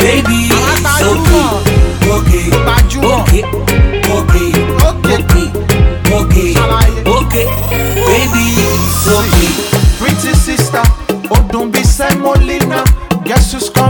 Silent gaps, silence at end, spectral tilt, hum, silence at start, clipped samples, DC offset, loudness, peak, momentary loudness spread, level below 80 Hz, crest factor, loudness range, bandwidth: none; 0 s; -5 dB/octave; none; 0 s; 0.2%; under 0.1%; -10 LUFS; 0 dBFS; 3 LU; -14 dBFS; 10 dB; 1 LU; over 20 kHz